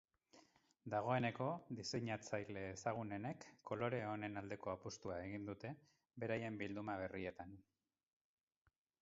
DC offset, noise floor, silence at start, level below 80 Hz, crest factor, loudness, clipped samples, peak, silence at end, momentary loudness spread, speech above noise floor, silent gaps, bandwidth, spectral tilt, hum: under 0.1%; -72 dBFS; 0.35 s; -72 dBFS; 22 dB; -46 LUFS; under 0.1%; -24 dBFS; 1.4 s; 12 LU; 27 dB; none; 7.6 kHz; -5 dB/octave; none